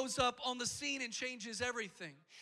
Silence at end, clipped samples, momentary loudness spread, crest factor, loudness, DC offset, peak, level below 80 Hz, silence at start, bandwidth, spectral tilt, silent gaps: 0 s; under 0.1%; 11 LU; 20 dB; -39 LUFS; under 0.1%; -22 dBFS; -68 dBFS; 0 s; 15 kHz; -2 dB/octave; none